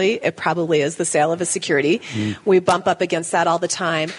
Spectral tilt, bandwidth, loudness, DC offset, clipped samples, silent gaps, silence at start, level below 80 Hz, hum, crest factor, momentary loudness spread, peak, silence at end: -4 dB/octave; 11 kHz; -19 LUFS; under 0.1%; under 0.1%; none; 0 s; -66 dBFS; none; 18 dB; 4 LU; -2 dBFS; 0 s